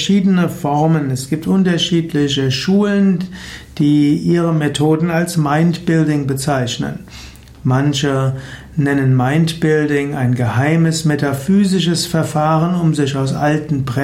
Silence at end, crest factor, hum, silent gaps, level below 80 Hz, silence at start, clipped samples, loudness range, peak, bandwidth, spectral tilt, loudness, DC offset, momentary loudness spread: 0 s; 12 dB; none; none; -44 dBFS; 0 s; under 0.1%; 2 LU; -4 dBFS; 15.5 kHz; -6 dB/octave; -15 LUFS; under 0.1%; 7 LU